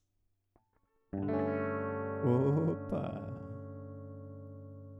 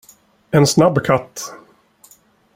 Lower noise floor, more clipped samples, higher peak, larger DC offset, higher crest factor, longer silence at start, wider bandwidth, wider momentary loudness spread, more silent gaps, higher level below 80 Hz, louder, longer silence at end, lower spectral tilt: first, -78 dBFS vs -52 dBFS; neither; second, -18 dBFS vs -2 dBFS; neither; about the same, 18 dB vs 18 dB; first, 1.15 s vs 0.55 s; second, 7.2 kHz vs 16.5 kHz; about the same, 18 LU vs 18 LU; neither; second, -66 dBFS vs -52 dBFS; second, -35 LUFS vs -15 LUFS; second, 0 s vs 1 s; first, -10.5 dB/octave vs -5.5 dB/octave